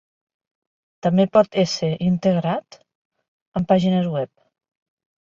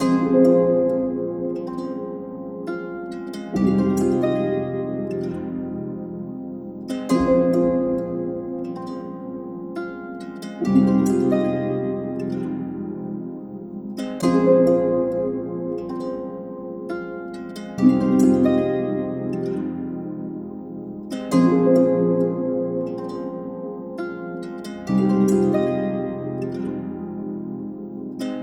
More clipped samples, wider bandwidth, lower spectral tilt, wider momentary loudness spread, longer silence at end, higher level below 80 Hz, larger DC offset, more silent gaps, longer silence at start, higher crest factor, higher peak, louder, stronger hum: neither; second, 7.6 kHz vs 12.5 kHz; about the same, -7 dB/octave vs -8 dB/octave; second, 11 LU vs 16 LU; first, 1 s vs 0 s; about the same, -56 dBFS vs -52 dBFS; neither; first, 2.95-3.11 s, 3.28-3.52 s vs none; first, 1.05 s vs 0 s; about the same, 18 dB vs 18 dB; about the same, -4 dBFS vs -4 dBFS; first, -20 LUFS vs -23 LUFS; neither